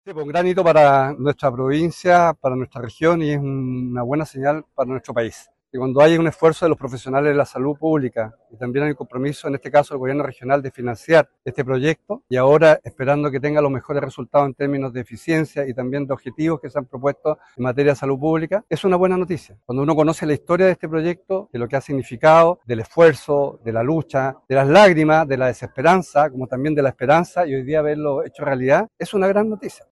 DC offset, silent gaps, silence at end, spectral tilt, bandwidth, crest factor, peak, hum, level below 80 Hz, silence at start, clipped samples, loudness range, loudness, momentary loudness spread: under 0.1%; none; 0.2 s; -7 dB/octave; 12 kHz; 16 dB; -2 dBFS; none; -54 dBFS; 0.05 s; under 0.1%; 6 LU; -19 LUFS; 11 LU